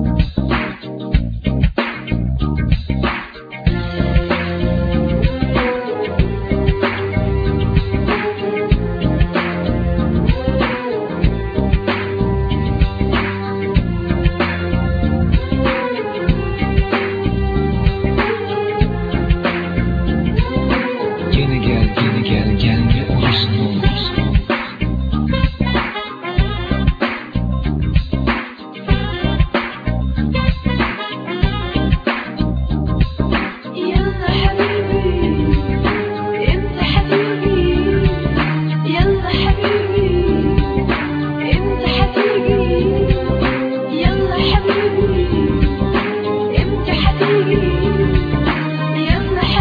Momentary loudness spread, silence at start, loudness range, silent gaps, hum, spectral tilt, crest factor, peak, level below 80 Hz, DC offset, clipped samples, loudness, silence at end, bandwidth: 5 LU; 0 s; 3 LU; none; none; -9 dB/octave; 16 dB; 0 dBFS; -22 dBFS; under 0.1%; under 0.1%; -17 LUFS; 0 s; 5 kHz